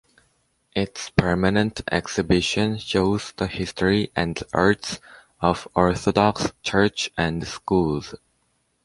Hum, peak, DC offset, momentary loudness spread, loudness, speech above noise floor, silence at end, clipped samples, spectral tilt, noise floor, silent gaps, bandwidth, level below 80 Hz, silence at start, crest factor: none; -2 dBFS; under 0.1%; 7 LU; -23 LUFS; 47 dB; 0.7 s; under 0.1%; -5 dB/octave; -69 dBFS; none; 11.5 kHz; -42 dBFS; 0.75 s; 22 dB